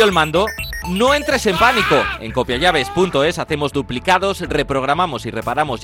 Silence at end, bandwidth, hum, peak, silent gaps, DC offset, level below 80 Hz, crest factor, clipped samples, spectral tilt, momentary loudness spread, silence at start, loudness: 0 s; 17 kHz; none; -2 dBFS; none; under 0.1%; -36 dBFS; 16 dB; under 0.1%; -4.5 dB/octave; 8 LU; 0 s; -17 LUFS